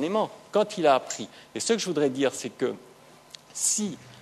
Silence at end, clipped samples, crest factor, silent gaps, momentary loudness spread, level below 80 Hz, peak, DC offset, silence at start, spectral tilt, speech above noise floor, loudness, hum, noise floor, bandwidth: 0 s; under 0.1%; 20 dB; none; 16 LU; -74 dBFS; -8 dBFS; under 0.1%; 0 s; -3 dB/octave; 23 dB; -26 LUFS; none; -50 dBFS; 13.5 kHz